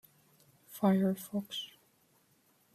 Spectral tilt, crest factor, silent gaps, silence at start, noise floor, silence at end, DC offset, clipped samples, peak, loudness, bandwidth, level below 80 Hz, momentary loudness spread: -6.5 dB/octave; 20 dB; none; 0.7 s; -70 dBFS; 1.1 s; under 0.1%; under 0.1%; -16 dBFS; -33 LUFS; 14.5 kHz; -78 dBFS; 18 LU